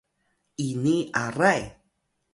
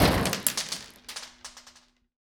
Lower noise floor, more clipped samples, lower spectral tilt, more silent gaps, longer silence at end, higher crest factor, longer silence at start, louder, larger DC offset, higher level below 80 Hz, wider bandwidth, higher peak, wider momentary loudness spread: first, -74 dBFS vs -57 dBFS; neither; first, -5.5 dB/octave vs -3.5 dB/octave; neither; second, 0.6 s vs 0.75 s; about the same, 22 dB vs 26 dB; first, 0.6 s vs 0 s; first, -25 LUFS vs -29 LUFS; neither; second, -58 dBFS vs -42 dBFS; second, 11.5 kHz vs over 20 kHz; about the same, -6 dBFS vs -4 dBFS; second, 16 LU vs 20 LU